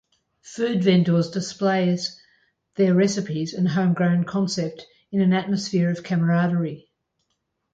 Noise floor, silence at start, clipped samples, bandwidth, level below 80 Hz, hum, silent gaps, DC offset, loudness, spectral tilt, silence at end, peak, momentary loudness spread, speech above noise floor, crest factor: -75 dBFS; 0.45 s; under 0.1%; 7.8 kHz; -66 dBFS; none; none; under 0.1%; -22 LUFS; -6.5 dB/octave; 0.95 s; -8 dBFS; 10 LU; 54 dB; 16 dB